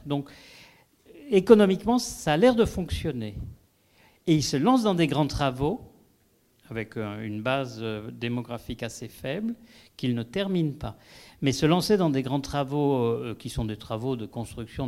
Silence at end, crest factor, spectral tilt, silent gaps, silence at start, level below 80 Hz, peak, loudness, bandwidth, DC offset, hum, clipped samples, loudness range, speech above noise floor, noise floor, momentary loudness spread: 0 s; 24 dB; -6 dB/octave; none; 0.05 s; -48 dBFS; -4 dBFS; -26 LUFS; 16 kHz; under 0.1%; none; under 0.1%; 8 LU; 39 dB; -65 dBFS; 15 LU